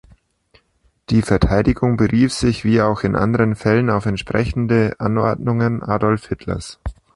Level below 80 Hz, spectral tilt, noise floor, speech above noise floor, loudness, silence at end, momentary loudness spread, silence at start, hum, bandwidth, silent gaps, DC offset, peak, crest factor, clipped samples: -34 dBFS; -7 dB/octave; -61 dBFS; 44 dB; -18 LUFS; 0.25 s; 7 LU; 1.1 s; none; 11.5 kHz; none; under 0.1%; 0 dBFS; 18 dB; under 0.1%